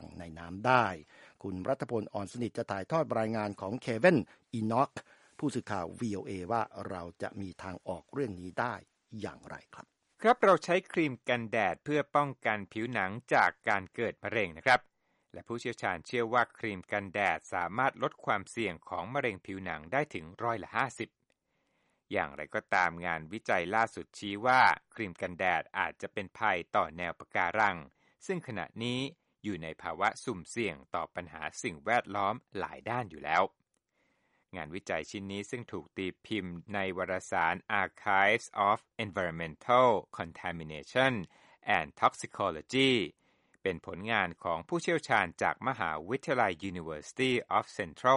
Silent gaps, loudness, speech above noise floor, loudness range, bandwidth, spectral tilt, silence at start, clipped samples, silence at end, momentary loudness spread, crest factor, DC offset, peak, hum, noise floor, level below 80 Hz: none; -32 LUFS; 45 dB; 7 LU; 11.5 kHz; -5 dB/octave; 0 s; under 0.1%; 0 s; 14 LU; 24 dB; under 0.1%; -8 dBFS; none; -78 dBFS; -66 dBFS